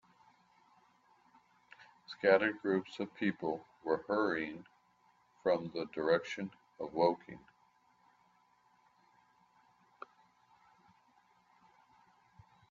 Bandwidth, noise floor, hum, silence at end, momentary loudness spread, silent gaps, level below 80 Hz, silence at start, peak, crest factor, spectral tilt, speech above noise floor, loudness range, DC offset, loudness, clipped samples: 7.6 kHz; -71 dBFS; none; 5.35 s; 25 LU; none; -80 dBFS; 2.1 s; -14 dBFS; 24 dB; -6.5 dB/octave; 36 dB; 6 LU; under 0.1%; -35 LUFS; under 0.1%